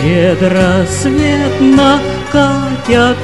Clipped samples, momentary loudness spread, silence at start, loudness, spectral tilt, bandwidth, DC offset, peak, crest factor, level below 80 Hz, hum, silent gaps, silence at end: 0.1%; 5 LU; 0 s; -11 LUFS; -5.5 dB/octave; 12 kHz; 1%; 0 dBFS; 10 dB; -30 dBFS; none; none; 0 s